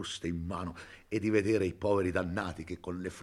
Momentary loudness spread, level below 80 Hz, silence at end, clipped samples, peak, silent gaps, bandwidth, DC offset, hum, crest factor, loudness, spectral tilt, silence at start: 11 LU; -58 dBFS; 0 s; under 0.1%; -14 dBFS; none; 12.5 kHz; under 0.1%; none; 18 dB; -33 LUFS; -6 dB/octave; 0 s